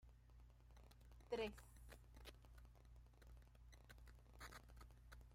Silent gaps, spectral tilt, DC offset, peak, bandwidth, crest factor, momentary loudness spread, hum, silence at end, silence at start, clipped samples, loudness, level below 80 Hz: none; -5 dB/octave; under 0.1%; -34 dBFS; 16 kHz; 24 dB; 18 LU; 60 Hz at -70 dBFS; 0 s; 0 s; under 0.1%; -59 LUFS; -66 dBFS